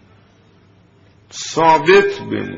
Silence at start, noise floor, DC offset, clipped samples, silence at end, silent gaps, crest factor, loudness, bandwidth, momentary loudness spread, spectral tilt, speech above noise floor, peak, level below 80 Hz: 1.35 s; -50 dBFS; under 0.1%; under 0.1%; 0 s; none; 16 dB; -13 LUFS; 7.8 kHz; 17 LU; -3 dB/octave; 37 dB; 0 dBFS; -54 dBFS